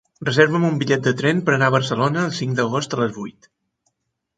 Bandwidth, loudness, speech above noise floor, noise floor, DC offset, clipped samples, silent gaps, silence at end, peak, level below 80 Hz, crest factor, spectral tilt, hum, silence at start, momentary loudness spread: 9.2 kHz; -19 LUFS; 55 dB; -74 dBFS; under 0.1%; under 0.1%; none; 1.05 s; 0 dBFS; -60 dBFS; 20 dB; -5.5 dB/octave; none; 0.2 s; 7 LU